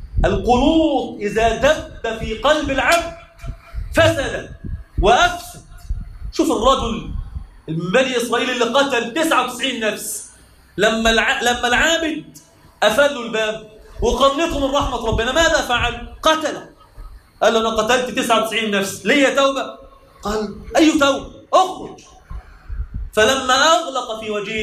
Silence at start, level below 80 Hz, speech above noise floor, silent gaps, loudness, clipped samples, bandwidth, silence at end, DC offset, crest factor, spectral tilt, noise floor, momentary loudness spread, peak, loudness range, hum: 0 s; -32 dBFS; 28 dB; none; -17 LUFS; under 0.1%; 15.5 kHz; 0 s; under 0.1%; 16 dB; -3.5 dB/octave; -45 dBFS; 17 LU; -2 dBFS; 2 LU; none